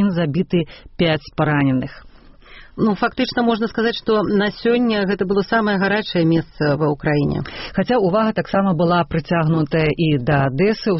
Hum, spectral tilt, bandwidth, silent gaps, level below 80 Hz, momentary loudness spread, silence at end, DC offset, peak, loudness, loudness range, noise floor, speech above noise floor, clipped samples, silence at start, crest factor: none; -5.5 dB/octave; 6 kHz; none; -42 dBFS; 4 LU; 0 s; under 0.1%; -4 dBFS; -18 LUFS; 2 LU; -43 dBFS; 25 dB; under 0.1%; 0 s; 14 dB